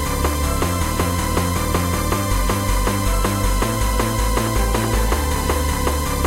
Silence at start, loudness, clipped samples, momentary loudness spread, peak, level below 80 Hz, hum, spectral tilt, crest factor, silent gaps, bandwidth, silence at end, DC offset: 0 s; -20 LUFS; under 0.1%; 1 LU; -4 dBFS; -22 dBFS; none; -4.5 dB/octave; 14 dB; none; 16 kHz; 0 s; under 0.1%